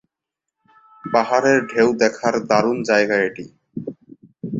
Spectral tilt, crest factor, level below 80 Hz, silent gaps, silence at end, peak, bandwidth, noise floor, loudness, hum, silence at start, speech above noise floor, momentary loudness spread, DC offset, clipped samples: -5 dB/octave; 18 dB; -62 dBFS; none; 0 s; -2 dBFS; 7.8 kHz; -83 dBFS; -18 LUFS; none; 1.05 s; 66 dB; 18 LU; under 0.1%; under 0.1%